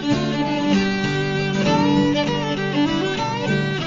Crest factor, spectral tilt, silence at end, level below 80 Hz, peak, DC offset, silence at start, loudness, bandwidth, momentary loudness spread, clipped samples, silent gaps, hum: 14 dB; -6 dB/octave; 0 s; -46 dBFS; -6 dBFS; under 0.1%; 0 s; -20 LUFS; 7.6 kHz; 4 LU; under 0.1%; none; none